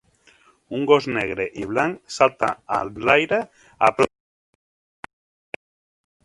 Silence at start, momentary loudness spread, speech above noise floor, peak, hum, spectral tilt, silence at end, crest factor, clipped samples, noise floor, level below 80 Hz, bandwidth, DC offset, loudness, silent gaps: 0.7 s; 19 LU; 35 dB; 0 dBFS; none; -5 dB/octave; 2.15 s; 24 dB; under 0.1%; -56 dBFS; -56 dBFS; 11.5 kHz; under 0.1%; -21 LUFS; none